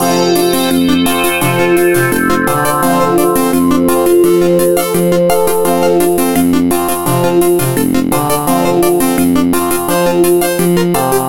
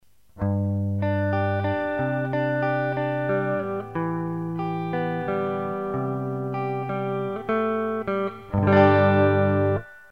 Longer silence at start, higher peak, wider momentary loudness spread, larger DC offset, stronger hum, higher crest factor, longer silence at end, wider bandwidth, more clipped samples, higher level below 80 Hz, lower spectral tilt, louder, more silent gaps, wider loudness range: second, 0 s vs 0.35 s; first, 0 dBFS vs -4 dBFS; second, 3 LU vs 10 LU; first, 4% vs 0.2%; neither; second, 10 dB vs 20 dB; about the same, 0 s vs 0.1 s; first, 17.5 kHz vs 5.4 kHz; neither; first, -38 dBFS vs -54 dBFS; second, -5 dB/octave vs -9.5 dB/octave; first, -11 LUFS vs -24 LUFS; neither; second, 1 LU vs 6 LU